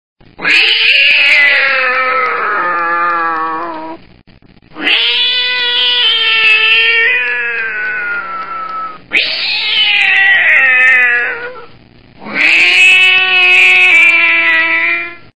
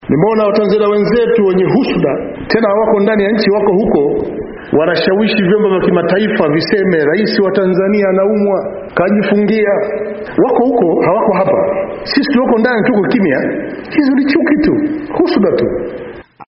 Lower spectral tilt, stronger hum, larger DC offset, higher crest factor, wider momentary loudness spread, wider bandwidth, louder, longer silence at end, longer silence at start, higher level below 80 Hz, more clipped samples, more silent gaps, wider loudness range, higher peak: second, -0.5 dB/octave vs -5 dB/octave; neither; first, 2% vs under 0.1%; about the same, 12 dB vs 12 dB; first, 14 LU vs 6 LU; first, 11 kHz vs 5.8 kHz; first, -7 LUFS vs -12 LUFS; about the same, 0 s vs 0.05 s; about the same, 0.15 s vs 0.05 s; second, -54 dBFS vs -42 dBFS; first, 0.3% vs under 0.1%; neither; first, 7 LU vs 1 LU; about the same, 0 dBFS vs 0 dBFS